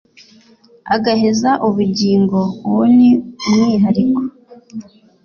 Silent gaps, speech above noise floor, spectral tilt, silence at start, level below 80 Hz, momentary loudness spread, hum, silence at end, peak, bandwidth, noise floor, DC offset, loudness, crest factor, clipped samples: none; 34 dB; -6.5 dB/octave; 0.85 s; -54 dBFS; 17 LU; none; 0.4 s; -2 dBFS; 7 kHz; -48 dBFS; under 0.1%; -14 LUFS; 12 dB; under 0.1%